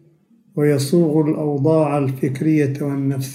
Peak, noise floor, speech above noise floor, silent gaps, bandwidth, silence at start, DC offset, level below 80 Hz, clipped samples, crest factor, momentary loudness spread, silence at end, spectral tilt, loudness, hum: -4 dBFS; -54 dBFS; 37 dB; none; 16 kHz; 0.55 s; under 0.1%; -66 dBFS; under 0.1%; 14 dB; 5 LU; 0 s; -7.5 dB/octave; -18 LUFS; none